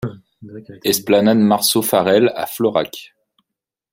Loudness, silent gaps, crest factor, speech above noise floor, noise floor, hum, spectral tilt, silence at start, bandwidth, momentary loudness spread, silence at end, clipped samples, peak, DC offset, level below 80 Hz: -16 LUFS; none; 16 dB; 67 dB; -83 dBFS; none; -4 dB/octave; 0 s; 16.5 kHz; 18 LU; 0.9 s; under 0.1%; -2 dBFS; under 0.1%; -58 dBFS